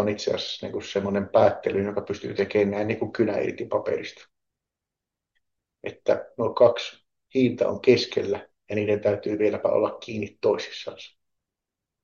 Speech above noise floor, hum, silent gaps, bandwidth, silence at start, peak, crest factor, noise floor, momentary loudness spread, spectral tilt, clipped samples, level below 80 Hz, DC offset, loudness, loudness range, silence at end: 63 dB; none; none; 7.2 kHz; 0 s; -6 dBFS; 20 dB; -87 dBFS; 12 LU; -6 dB/octave; under 0.1%; -68 dBFS; under 0.1%; -25 LUFS; 6 LU; 0.95 s